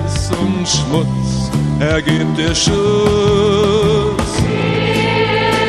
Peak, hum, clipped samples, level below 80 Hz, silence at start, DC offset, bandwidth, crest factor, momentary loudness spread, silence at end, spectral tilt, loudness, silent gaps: 0 dBFS; none; under 0.1%; -28 dBFS; 0 s; under 0.1%; 13 kHz; 14 dB; 5 LU; 0 s; -5 dB/octave; -14 LUFS; none